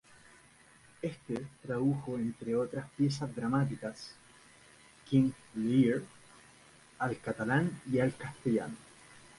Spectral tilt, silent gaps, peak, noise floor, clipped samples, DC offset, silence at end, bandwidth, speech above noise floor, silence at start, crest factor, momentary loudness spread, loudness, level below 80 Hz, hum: -7 dB/octave; none; -16 dBFS; -61 dBFS; under 0.1%; under 0.1%; 0.2 s; 11.5 kHz; 28 dB; 1.05 s; 18 dB; 12 LU; -33 LUFS; -66 dBFS; none